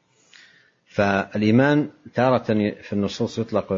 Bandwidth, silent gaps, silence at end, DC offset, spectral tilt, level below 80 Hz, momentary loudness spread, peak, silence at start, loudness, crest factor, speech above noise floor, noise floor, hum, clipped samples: 7.6 kHz; none; 0 s; under 0.1%; -7 dB/octave; -58 dBFS; 9 LU; -4 dBFS; 0.95 s; -22 LUFS; 18 dB; 34 dB; -55 dBFS; none; under 0.1%